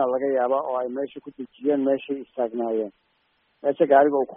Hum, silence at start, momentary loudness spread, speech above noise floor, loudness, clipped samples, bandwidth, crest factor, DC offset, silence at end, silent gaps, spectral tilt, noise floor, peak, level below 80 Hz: none; 0 s; 15 LU; 45 dB; -24 LUFS; under 0.1%; 3.7 kHz; 20 dB; under 0.1%; 0 s; none; -4.5 dB/octave; -68 dBFS; -4 dBFS; -74 dBFS